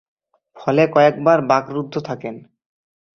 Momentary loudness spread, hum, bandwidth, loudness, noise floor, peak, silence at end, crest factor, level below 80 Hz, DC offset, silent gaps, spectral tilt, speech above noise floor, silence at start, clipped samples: 15 LU; none; 6.6 kHz; -17 LUFS; -45 dBFS; -2 dBFS; 0.75 s; 18 dB; -62 dBFS; under 0.1%; none; -7 dB/octave; 28 dB; 0.55 s; under 0.1%